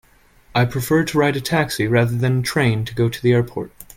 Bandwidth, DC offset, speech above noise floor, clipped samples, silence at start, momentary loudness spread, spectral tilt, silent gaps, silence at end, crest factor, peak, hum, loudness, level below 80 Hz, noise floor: 16.5 kHz; under 0.1%; 33 dB; under 0.1%; 0.55 s; 4 LU; -6 dB/octave; none; 0.15 s; 18 dB; -2 dBFS; none; -19 LUFS; -46 dBFS; -51 dBFS